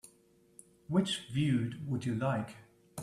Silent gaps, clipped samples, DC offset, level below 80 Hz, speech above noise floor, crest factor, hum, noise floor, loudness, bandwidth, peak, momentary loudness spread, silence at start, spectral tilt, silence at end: none; under 0.1%; under 0.1%; -68 dBFS; 33 dB; 18 dB; none; -66 dBFS; -34 LUFS; 13.5 kHz; -18 dBFS; 14 LU; 0.05 s; -6 dB/octave; 0 s